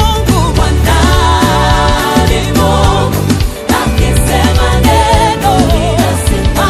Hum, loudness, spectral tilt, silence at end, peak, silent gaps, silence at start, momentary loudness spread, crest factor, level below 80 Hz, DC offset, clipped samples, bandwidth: none; -10 LUFS; -5 dB/octave; 0 s; 0 dBFS; none; 0 s; 3 LU; 8 dB; -14 dBFS; under 0.1%; 0.5%; 15.5 kHz